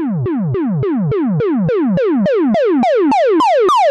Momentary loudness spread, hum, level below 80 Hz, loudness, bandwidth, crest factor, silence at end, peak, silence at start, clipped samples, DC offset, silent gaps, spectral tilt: 6 LU; none; -48 dBFS; -14 LUFS; 11.5 kHz; 6 dB; 0 s; -8 dBFS; 0 s; under 0.1%; under 0.1%; none; -7.5 dB/octave